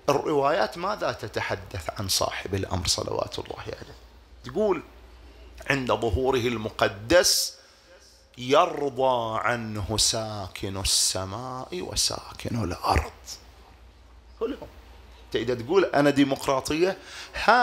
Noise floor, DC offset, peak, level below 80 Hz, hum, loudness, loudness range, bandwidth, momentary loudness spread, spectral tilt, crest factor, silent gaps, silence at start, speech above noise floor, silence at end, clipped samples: -53 dBFS; under 0.1%; -4 dBFS; -44 dBFS; none; -25 LUFS; 6 LU; 16 kHz; 15 LU; -3.5 dB/octave; 22 dB; none; 0.05 s; 28 dB; 0 s; under 0.1%